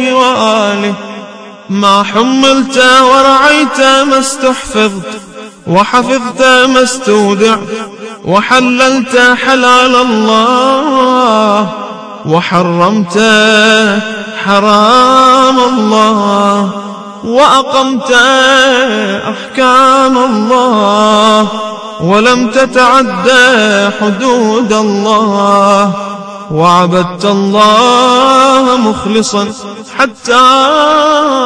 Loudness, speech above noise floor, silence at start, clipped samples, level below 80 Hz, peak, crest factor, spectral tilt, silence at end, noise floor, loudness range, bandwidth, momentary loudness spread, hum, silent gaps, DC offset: -7 LUFS; 21 dB; 0 s; 3%; -46 dBFS; 0 dBFS; 8 dB; -4 dB/octave; 0 s; -28 dBFS; 2 LU; 11 kHz; 12 LU; none; none; under 0.1%